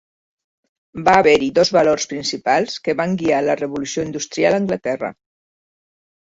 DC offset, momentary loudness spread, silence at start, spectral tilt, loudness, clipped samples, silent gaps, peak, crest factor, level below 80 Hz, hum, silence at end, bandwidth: under 0.1%; 10 LU; 0.95 s; -4 dB/octave; -18 LUFS; under 0.1%; none; -2 dBFS; 18 dB; -54 dBFS; none; 1.15 s; 8 kHz